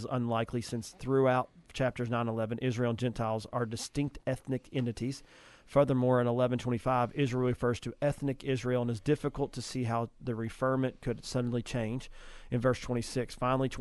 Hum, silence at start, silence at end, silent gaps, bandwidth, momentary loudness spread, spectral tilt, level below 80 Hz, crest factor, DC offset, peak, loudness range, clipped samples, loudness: none; 0 s; 0 s; none; 12.5 kHz; 9 LU; -6.5 dB/octave; -54 dBFS; 18 dB; under 0.1%; -14 dBFS; 4 LU; under 0.1%; -32 LUFS